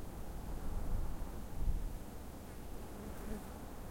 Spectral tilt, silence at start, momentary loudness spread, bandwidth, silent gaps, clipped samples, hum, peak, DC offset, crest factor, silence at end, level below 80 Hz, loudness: -6 dB/octave; 0 s; 7 LU; 16.5 kHz; none; under 0.1%; none; -22 dBFS; under 0.1%; 18 dB; 0 s; -42 dBFS; -47 LUFS